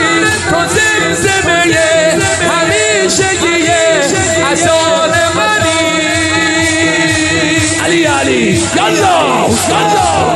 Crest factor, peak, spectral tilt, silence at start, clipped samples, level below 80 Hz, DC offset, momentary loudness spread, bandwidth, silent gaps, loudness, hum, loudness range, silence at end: 10 dB; 0 dBFS; -3 dB/octave; 0 s; under 0.1%; -36 dBFS; under 0.1%; 2 LU; 14.5 kHz; none; -10 LUFS; none; 1 LU; 0 s